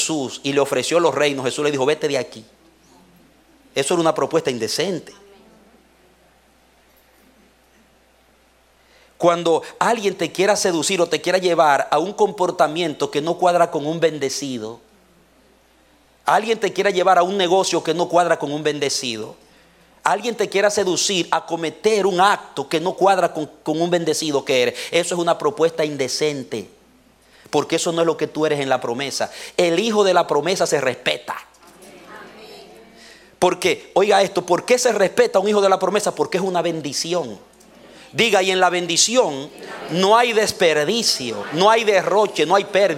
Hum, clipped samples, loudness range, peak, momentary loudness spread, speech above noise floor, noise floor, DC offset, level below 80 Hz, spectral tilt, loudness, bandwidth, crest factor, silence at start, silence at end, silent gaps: none; under 0.1%; 6 LU; -2 dBFS; 9 LU; 37 dB; -56 dBFS; under 0.1%; -64 dBFS; -3 dB/octave; -19 LUFS; 16.5 kHz; 18 dB; 0 s; 0 s; none